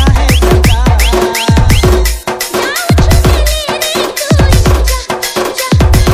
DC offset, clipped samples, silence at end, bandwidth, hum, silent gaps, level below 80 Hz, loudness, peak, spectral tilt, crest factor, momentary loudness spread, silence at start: under 0.1%; 2%; 0 s; 16.5 kHz; none; none; -12 dBFS; -10 LUFS; 0 dBFS; -5 dB/octave; 8 dB; 6 LU; 0 s